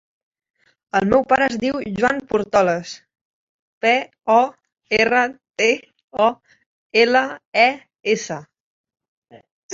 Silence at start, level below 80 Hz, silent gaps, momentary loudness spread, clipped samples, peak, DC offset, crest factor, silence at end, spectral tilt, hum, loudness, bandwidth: 0.95 s; -54 dBFS; 3.21-3.81 s, 6.04-6.08 s, 6.66-6.90 s, 7.45-7.52 s, 8.60-8.84 s, 9.08-9.22 s, 9.51-9.69 s; 10 LU; under 0.1%; -2 dBFS; under 0.1%; 18 dB; 0 s; -4 dB/octave; none; -19 LUFS; 7.8 kHz